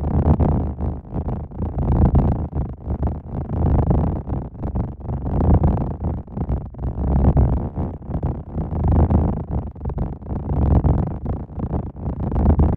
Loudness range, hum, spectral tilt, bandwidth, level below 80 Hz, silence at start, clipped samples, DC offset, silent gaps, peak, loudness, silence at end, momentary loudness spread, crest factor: 2 LU; none; -13 dB/octave; 2.8 kHz; -24 dBFS; 0 s; under 0.1%; under 0.1%; none; -2 dBFS; -22 LUFS; 0 s; 11 LU; 16 dB